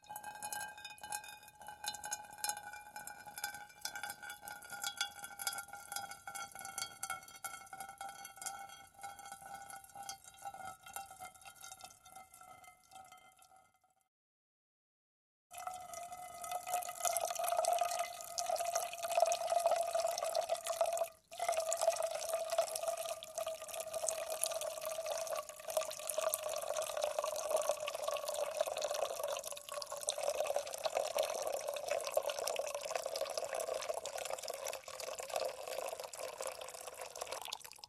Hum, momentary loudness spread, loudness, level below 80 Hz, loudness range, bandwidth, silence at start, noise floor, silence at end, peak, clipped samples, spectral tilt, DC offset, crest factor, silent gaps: none; 14 LU; -40 LUFS; -78 dBFS; 14 LU; 16 kHz; 0.05 s; -72 dBFS; 0 s; -12 dBFS; under 0.1%; 0.5 dB/octave; under 0.1%; 28 dB; 14.08-15.50 s